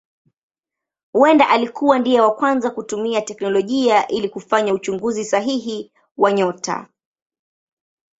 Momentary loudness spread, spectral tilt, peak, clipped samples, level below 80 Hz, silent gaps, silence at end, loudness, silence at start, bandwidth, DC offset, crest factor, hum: 10 LU; -4.5 dB/octave; 0 dBFS; under 0.1%; -64 dBFS; 6.11-6.15 s; 1.35 s; -18 LUFS; 1.15 s; 8 kHz; under 0.1%; 18 dB; none